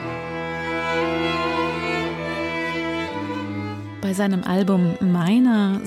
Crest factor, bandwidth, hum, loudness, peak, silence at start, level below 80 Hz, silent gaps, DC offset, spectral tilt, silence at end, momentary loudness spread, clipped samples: 12 dB; 14 kHz; none; -22 LUFS; -10 dBFS; 0 s; -54 dBFS; none; under 0.1%; -6.5 dB/octave; 0 s; 10 LU; under 0.1%